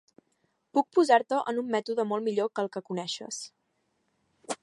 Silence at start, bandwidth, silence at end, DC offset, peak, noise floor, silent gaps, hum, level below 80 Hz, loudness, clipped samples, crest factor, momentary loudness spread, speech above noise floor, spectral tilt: 0.75 s; 11.5 kHz; 0.1 s; under 0.1%; -8 dBFS; -75 dBFS; none; none; -84 dBFS; -28 LUFS; under 0.1%; 22 dB; 15 LU; 48 dB; -4 dB/octave